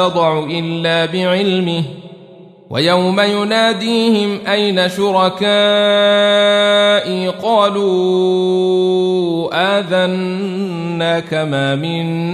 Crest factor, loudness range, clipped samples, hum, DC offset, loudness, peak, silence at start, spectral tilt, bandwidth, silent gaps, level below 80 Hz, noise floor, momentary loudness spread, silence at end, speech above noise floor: 12 dB; 4 LU; under 0.1%; none; under 0.1%; -14 LUFS; -2 dBFS; 0 s; -5.5 dB/octave; 13.5 kHz; none; -60 dBFS; -39 dBFS; 8 LU; 0 s; 25 dB